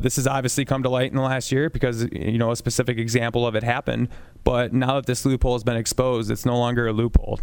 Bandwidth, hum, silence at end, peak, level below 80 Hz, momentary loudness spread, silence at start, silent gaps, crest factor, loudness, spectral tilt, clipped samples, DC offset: 19 kHz; none; 0 s; 0 dBFS; -32 dBFS; 3 LU; 0 s; none; 22 dB; -23 LUFS; -5.5 dB/octave; under 0.1%; under 0.1%